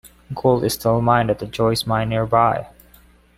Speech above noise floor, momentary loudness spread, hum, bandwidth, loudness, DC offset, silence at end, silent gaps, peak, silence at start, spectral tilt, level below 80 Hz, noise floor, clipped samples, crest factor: 32 dB; 5 LU; none; 16 kHz; -19 LUFS; under 0.1%; 0.7 s; none; -2 dBFS; 0.05 s; -6 dB/octave; -44 dBFS; -51 dBFS; under 0.1%; 18 dB